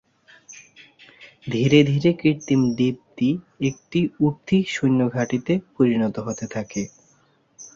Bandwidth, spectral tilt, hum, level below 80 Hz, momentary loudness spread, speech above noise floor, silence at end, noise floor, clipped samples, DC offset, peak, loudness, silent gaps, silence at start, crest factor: 7.6 kHz; -6.5 dB/octave; none; -56 dBFS; 13 LU; 40 dB; 0.1 s; -61 dBFS; under 0.1%; under 0.1%; -2 dBFS; -22 LUFS; none; 0.5 s; 20 dB